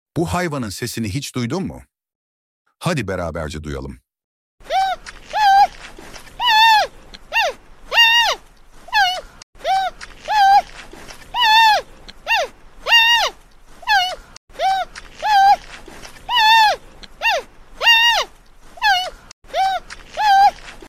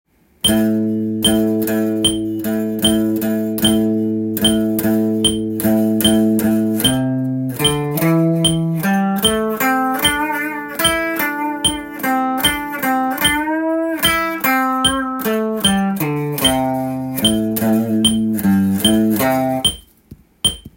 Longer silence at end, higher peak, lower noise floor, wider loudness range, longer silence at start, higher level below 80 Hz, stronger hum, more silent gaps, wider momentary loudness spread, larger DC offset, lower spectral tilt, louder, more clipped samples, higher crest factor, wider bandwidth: about the same, 0 s vs 0.1 s; about the same, 0 dBFS vs 0 dBFS; about the same, -43 dBFS vs -44 dBFS; first, 10 LU vs 1 LU; second, 0.15 s vs 0.45 s; about the same, -44 dBFS vs -42 dBFS; neither; first, 2.15-2.65 s, 4.24-4.58 s, 9.43-9.53 s, 14.37-14.48 s, 19.33-19.42 s vs none; first, 19 LU vs 5 LU; neither; second, -2.5 dB/octave vs -4 dB/octave; about the same, -16 LUFS vs -16 LUFS; neither; about the same, 18 dB vs 16 dB; about the same, 16 kHz vs 17 kHz